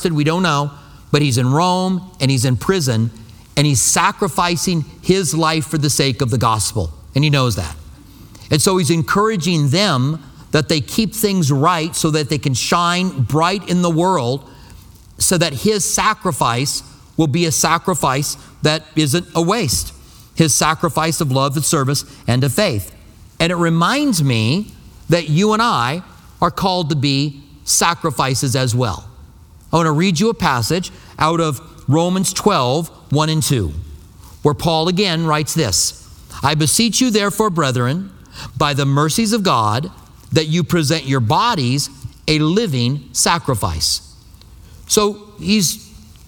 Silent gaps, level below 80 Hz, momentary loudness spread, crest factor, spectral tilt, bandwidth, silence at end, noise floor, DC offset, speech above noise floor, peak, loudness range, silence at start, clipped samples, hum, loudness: none; -42 dBFS; 7 LU; 16 dB; -4.5 dB/octave; 19 kHz; 0.25 s; -42 dBFS; under 0.1%; 26 dB; 0 dBFS; 2 LU; 0 s; under 0.1%; none; -16 LUFS